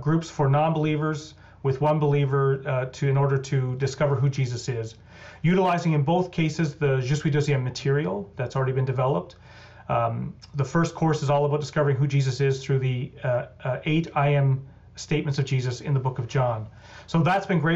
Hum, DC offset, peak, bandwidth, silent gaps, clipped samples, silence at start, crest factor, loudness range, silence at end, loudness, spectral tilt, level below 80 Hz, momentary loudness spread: none; under 0.1%; -14 dBFS; 8 kHz; none; under 0.1%; 0 s; 10 dB; 2 LU; 0 s; -25 LUFS; -7 dB/octave; -54 dBFS; 8 LU